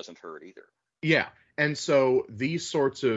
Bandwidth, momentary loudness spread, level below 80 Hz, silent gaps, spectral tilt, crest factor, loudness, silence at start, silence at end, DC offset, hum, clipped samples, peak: 8 kHz; 20 LU; -72 dBFS; none; -5 dB/octave; 18 dB; -26 LUFS; 0.05 s; 0 s; under 0.1%; none; under 0.1%; -10 dBFS